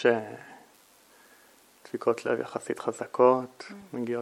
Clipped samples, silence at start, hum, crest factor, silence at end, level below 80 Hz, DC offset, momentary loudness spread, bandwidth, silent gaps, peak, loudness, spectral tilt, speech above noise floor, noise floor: under 0.1%; 0 s; none; 22 dB; 0 s; -80 dBFS; under 0.1%; 20 LU; 14 kHz; none; -8 dBFS; -28 LUFS; -5.5 dB/octave; 31 dB; -59 dBFS